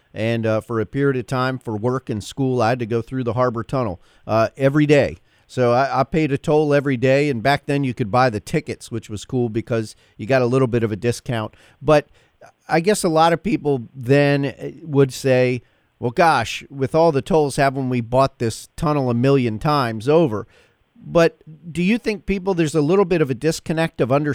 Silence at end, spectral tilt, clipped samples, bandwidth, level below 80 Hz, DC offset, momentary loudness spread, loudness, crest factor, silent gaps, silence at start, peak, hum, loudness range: 0 s; -6.5 dB/octave; under 0.1%; 15.5 kHz; -46 dBFS; under 0.1%; 9 LU; -19 LUFS; 18 dB; none; 0.15 s; -2 dBFS; none; 3 LU